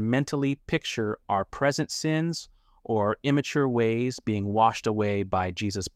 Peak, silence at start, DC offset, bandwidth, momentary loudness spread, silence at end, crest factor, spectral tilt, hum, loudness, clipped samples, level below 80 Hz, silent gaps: -8 dBFS; 0 s; under 0.1%; 15.5 kHz; 7 LU; 0.05 s; 18 dB; -5.5 dB/octave; none; -27 LUFS; under 0.1%; -56 dBFS; none